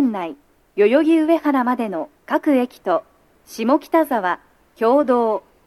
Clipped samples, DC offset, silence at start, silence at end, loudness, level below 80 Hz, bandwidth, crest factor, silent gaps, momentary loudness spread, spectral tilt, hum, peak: under 0.1%; under 0.1%; 0 s; 0.25 s; -19 LUFS; -64 dBFS; 13 kHz; 16 dB; none; 13 LU; -6 dB/octave; none; -4 dBFS